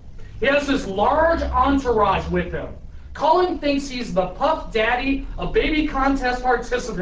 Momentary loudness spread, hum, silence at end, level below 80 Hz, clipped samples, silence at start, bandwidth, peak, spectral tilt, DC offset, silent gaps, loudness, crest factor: 7 LU; none; 0 s; -32 dBFS; under 0.1%; 0 s; 8 kHz; -6 dBFS; -5.5 dB/octave; under 0.1%; none; -21 LUFS; 16 dB